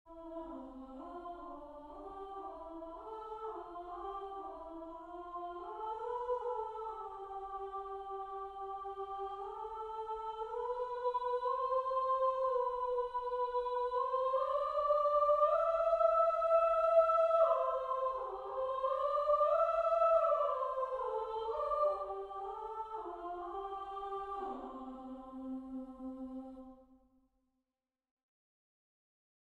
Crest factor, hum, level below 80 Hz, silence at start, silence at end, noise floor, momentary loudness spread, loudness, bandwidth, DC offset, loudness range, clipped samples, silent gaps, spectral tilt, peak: 18 dB; none; -66 dBFS; 0.05 s; 2.75 s; under -90 dBFS; 18 LU; -35 LUFS; 7.8 kHz; under 0.1%; 16 LU; under 0.1%; none; -5.5 dB/octave; -18 dBFS